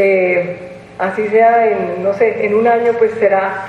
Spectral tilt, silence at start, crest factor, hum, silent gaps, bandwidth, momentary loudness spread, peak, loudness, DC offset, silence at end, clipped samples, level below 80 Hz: -7.5 dB/octave; 0 s; 12 dB; none; none; 7.6 kHz; 10 LU; 0 dBFS; -14 LUFS; under 0.1%; 0 s; under 0.1%; -56 dBFS